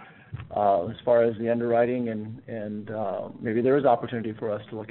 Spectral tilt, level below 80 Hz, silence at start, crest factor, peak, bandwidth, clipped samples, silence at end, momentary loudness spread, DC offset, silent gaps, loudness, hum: -6.5 dB/octave; -62 dBFS; 0 s; 18 dB; -8 dBFS; 4.2 kHz; under 0.1%; 0 s; 13 LU; under 0.1%; none; -26 LUFS; none